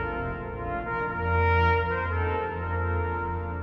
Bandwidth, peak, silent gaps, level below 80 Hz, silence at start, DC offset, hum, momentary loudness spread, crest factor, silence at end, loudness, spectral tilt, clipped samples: 5.4 kHz; -12 dBFS; none; -38 dBFS; 0 s; under 0.1%; none; 10 LU; 14 dB; 0 s; -27 LUFS; -9 dB/octave; under 0.1%